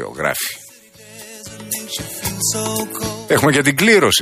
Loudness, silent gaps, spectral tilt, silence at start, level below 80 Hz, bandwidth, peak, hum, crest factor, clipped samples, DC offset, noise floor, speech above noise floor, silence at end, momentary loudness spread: -17 LUFS; none; -3 dB/octave; 0 s; -48 dBFS; 15.5 kHz; -2 dBFS; none; 18 dB; under 0.1%; under 0.1%; -43 dBFS; 26 dB; 0 s; 21 LU